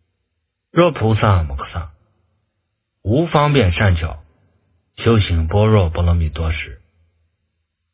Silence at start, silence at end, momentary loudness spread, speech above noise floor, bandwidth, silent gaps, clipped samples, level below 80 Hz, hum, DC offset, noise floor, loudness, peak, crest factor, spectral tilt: 0.75 s; 1.15 s; 14 LU; 58 dB; 4 kHz; none; under 0.1%; -26 dBFS; none; under 0.1%; -73 dBFS; -17 LUFS; 0 dBFS; 18 dB; -11 dB/octave